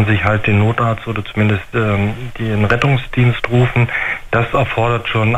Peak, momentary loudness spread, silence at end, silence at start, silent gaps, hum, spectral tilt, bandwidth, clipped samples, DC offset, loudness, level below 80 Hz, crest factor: -2 dBFS; 5 LU; 0 s; 0 s; none; none; -7.5 dB/octave; 8.4 kHz; under 0.1%; under 0.1%; -16 LUFS; -34 dBFS; 14 dB